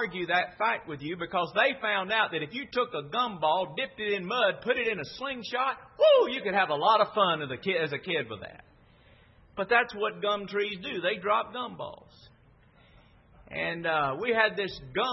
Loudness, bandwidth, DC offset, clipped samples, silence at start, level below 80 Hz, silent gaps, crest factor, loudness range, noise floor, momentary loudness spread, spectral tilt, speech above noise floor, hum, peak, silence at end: -28 LUFS; 6 kHz; under 0.1%; under 0.1%; 0 s; -64 dBFS; none; 22 dB; 7 LU; -59 dBFS; 12 LU; -5.5 dB/octave; 31 dB; none; -8 dBFS; 0 s